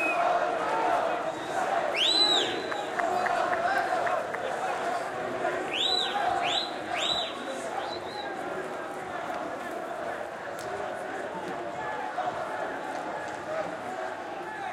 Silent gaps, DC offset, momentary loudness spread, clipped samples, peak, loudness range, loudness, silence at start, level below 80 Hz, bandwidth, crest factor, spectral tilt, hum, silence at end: none; under 0.1%; 10 LU; under 0.1%; -12 dBFS; 9 LU; -29 LUFS; 0 s; -68 dBFS; 15.5 kHz; 18 dB; -2.5 dB/octave; none; 0 s